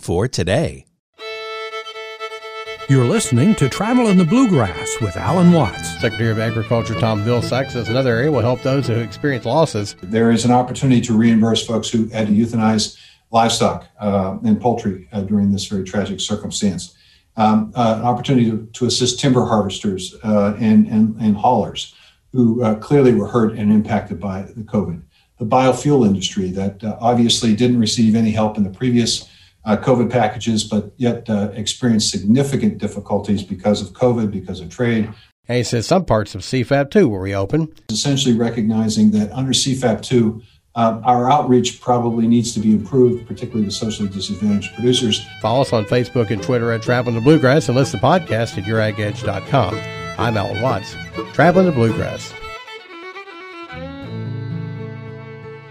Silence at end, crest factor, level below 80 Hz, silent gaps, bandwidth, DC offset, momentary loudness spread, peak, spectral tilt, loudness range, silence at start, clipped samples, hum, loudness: 0 s; 16 dB; -46 dBFS; 0.99-1.13 s, 35.32-35.43 s; 12.5 kHz; under 0.1%; 14 LU; -2 dBFS; -5.5 dB/octave; 4 LU; 0.05 s; under 0.1%; none; -17 LUFS